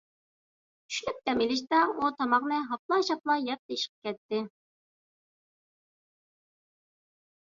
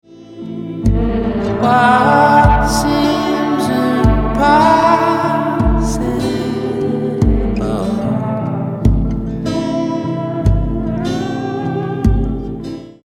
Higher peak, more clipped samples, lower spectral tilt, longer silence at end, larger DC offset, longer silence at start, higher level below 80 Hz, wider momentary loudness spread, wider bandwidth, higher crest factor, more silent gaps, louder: second, -12 dBFS vs 0 dBFS; neither; second, -3 dB/octave vs -6.5 dB/octave; first, 3.1 s vs 0.15 s; neither; first, 0.9 s vs 0.1 s; second, -72 dBFS vs -22 dBFS; about the same, 8 LU vs 10 LU; second, 7.8 kHz vs 15 kHz; first, 20 dB vs 14 dB; first, 2.79-2.89 s, 3.59-3.69 s, 3.89-4.02 s, 4.18-4.29 s vs none; second, -29 LUFS vs -15 LUFS